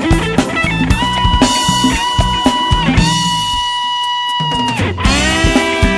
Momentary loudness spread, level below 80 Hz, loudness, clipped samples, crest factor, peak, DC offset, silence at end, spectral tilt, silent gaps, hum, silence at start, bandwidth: 4 LU; -22 dBFS; -13 LUFS; under 0.1%; 12 dB; 0 dBFS; under 0.1%; 0 s; -4 dB/octave; none; none; 0 s; 11 kHz